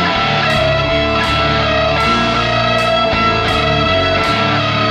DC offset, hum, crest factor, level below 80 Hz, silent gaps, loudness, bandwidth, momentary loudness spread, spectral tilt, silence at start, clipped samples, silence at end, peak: under 0.1%; none; 12 dB; -30 dBFS; none; -13 LUFS; 14.5 kHz; 1 LU; -5 dB/octave; 0 s; under 0.1%; 0 s; -2 dBFS